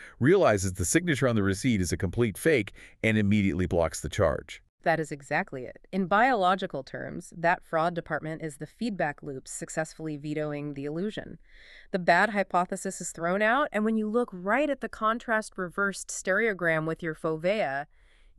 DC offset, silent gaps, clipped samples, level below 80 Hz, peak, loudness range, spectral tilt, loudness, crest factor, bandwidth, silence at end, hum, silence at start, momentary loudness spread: under 0.1%; 4.69-4.78 s; under 0.1%; -52 dBFS; -8 dBFS; 6 LU; -5 dB/octave; -28 LUFS; 20 dB; 13.5 kHz; 0.55 s; none; 0 s; 13 LU